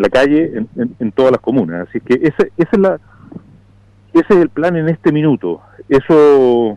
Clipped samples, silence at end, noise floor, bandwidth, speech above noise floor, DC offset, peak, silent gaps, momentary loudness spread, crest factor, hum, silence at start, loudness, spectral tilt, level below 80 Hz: under 0.1%; 0 s; -46 dBFS; 10 kHz; 34 dB; under 0.1%; -4 dBFS; none; 12 LU; 10 dB; none; 0 s; -13 LUFS; -8 dB/octave; -44 dBFS